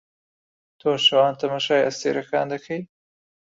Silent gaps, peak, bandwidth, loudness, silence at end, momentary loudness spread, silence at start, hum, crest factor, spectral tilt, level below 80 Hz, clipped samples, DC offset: none; -4 dBFS; 7.8 kHz; -21 LUFS; 0.75 s; 12 LU; 0.85 s; none; 18 dB; -3.5 dB/octave; -70 dBFS; under 0.1%; under 0.1%